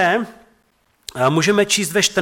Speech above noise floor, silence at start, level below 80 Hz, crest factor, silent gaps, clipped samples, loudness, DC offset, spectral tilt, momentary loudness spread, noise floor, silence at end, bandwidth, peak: 44 dB; 0 s; -58 dBFS; 14 dB; none; under 0.1%; -17 LUFS; under 0.1%; -3 dB/octave; 18 LU; -61 dBFS; 0 s; 17 kHz; -6 dBFS